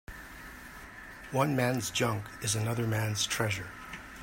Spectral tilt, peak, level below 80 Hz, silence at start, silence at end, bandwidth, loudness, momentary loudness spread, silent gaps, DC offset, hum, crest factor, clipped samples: -4 dB/octave; -12 dBFS; -56 dBFS; 0.1 s; 0 s; 16.5 kHz; -31 LUFS; 17 LU; none; under 0.1%; none; 22 dB; under 0.1%